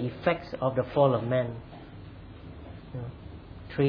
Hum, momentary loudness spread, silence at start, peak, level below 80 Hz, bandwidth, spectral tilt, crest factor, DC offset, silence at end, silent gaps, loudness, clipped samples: none; 22 LU; 0 s; -10 dBFS; -52 dBFS; 5.4 kHz; -10 dB/octave; 20 dB; under 0.1%; 0 s; none; -28 LUFS; under 0.1%